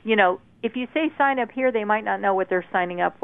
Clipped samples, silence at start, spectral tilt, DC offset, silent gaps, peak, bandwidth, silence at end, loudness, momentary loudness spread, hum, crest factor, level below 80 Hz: under 0.1%; 0.05 s; -8 dB/octave; 0.1%; none; -4 dBFS; 3.9 kHz; 0.1 s; -23 LUFS; 6 LU; none; 20 dB; -66 dBFS